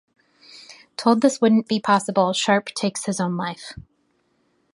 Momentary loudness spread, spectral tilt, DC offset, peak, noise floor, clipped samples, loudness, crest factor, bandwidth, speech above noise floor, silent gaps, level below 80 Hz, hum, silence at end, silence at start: 19 LU; -4.5 dB/octave; under 0.1%; -4 dBFS; -67 dBFS; under 0.1%; -21 LUFS; 20 dB; 11.5 kHz; 46 dB; none; -60 dBFS; none; 0.95 s; 0.55 s